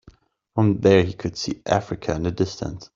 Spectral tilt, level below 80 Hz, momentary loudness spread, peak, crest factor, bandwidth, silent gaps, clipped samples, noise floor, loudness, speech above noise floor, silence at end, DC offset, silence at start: -6.5 dB/octave; -48 dBFS; 11 LU; -2 dBFS; 20 dB; 7.6 kHz; none; under 0.1%; -53 dBFS; -22 LUFS; 31 dB; 0.1 s; under 0.1%; 0.55 s